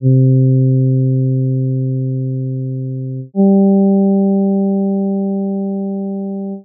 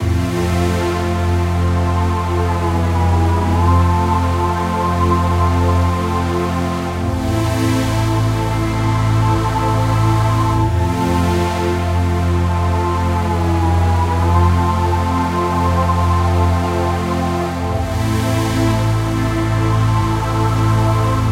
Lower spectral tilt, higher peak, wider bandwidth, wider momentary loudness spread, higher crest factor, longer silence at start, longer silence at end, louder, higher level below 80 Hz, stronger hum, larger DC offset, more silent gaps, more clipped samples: first, -9.5 dB/octave vs -7 dB/octave; about the same, -4 dBFS vs -2 dBFS; second, 0.8 kHz vs 15 kHz; first, 11 LU vs 3 LU; about the same, 10 dB vs 14 dB; about the same, 0 s vs 0 s; about the same, 0.05 s vs 0 s; about the same, -15 LUFS vs -16 LUFS; second, -72 dBFS vs -26 dBFS; neither; neither; neither; neither